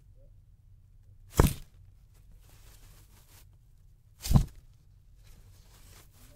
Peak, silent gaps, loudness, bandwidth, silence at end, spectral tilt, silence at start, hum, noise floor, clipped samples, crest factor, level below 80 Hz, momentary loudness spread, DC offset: -6 dBFS; none; -30 LUFS; 16 kHz; 1.9 s; -6 dB/octave; 1.35 s; none; -58 dBFS; under 0.1%; 28 dB; -38 dBFS; 29 LU; under 0.1%